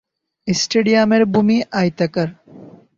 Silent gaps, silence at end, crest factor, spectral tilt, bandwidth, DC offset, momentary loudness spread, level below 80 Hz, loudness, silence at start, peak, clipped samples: none; 0.3 s; 16 dB; -5 dB/octave; 7.6 kHz; under 0.1%; 9 LU; -56 dBFS; -17 LUFS; 0.45 s; -2 dBFS; under 0.1%